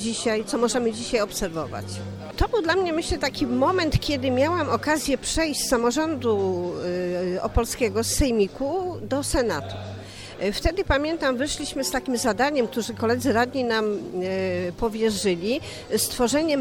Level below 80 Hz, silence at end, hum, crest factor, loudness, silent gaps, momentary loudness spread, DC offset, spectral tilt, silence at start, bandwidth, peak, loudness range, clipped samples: -38 dBFS; 0 s; none; 18 dB; -24 LUFS; none; 7 LU; under 0.1%; -4 dB/octave; 0 s; 18 kHz; -6 dBFS; 2 LU; under 0.1%